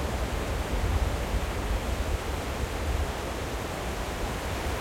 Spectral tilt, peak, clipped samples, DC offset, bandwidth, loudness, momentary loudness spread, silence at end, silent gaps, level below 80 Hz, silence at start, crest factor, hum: -5 dB/octave; -14 dBFS; under 0.1%; under 0.1%; 16.5 kHz; -31 LUFS; 4 LU; 0 s; none; -32 dBFS; 0 s; 16 dB; none